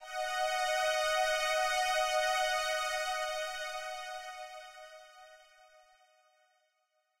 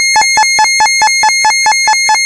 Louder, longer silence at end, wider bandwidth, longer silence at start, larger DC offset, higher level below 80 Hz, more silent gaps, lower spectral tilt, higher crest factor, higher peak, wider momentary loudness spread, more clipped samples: second, -32 LUFS vs -7 LUFS; first, 1.85 s vs 0 s; first, 16 kHz vs 11.5 kHz; about the same, 0 s vs 0 s; neither; second, -64 dBFS vs -48 dBFS; neither; about the same, 2.5 dB/octave vs 3 dB/octave; first, 16 dB vs 8 dB; second, -20 dBFS vs 0 dBFS; first, 17 LU vs 1 LU; neither